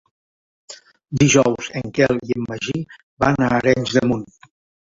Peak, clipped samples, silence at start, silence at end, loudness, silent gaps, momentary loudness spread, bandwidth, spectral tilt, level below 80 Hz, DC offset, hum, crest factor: -2 dBFS; under 0.1%; 0.7 s; 0.65 s; -19 LUFS; 3.03-3.17 s; 17 LU; 7.8 kHz; -5 dB/octave; -48 dBFS; under 0.1%; none; 18 dB